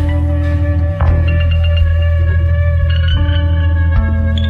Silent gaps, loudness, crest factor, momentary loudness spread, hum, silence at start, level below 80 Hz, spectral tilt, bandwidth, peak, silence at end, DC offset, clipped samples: none; -14 LUFS; 10 dB; 2 LU; none; 0 s; -16 dBFS; -8.5 dB/octave; 4.4 kHz; -2 dBFS; 0 s; under 0.1%; under 0.1%